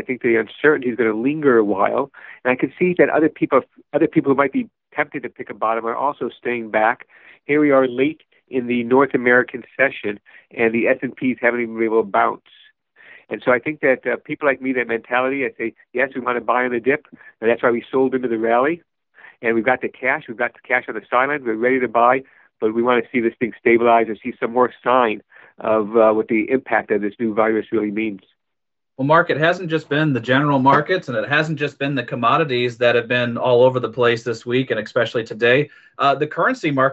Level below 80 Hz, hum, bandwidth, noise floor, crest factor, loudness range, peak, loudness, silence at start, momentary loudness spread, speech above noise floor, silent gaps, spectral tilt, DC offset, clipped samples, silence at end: -66 dBFS; none; 8 kHz; -84 dBFS; 18 dB; 3 LU; -2 dBFS; -19 LUFS; 0 s; 9 LU; 65 dB; none; -7 dB/octave; under 0.1%; under 0.1%; 0 s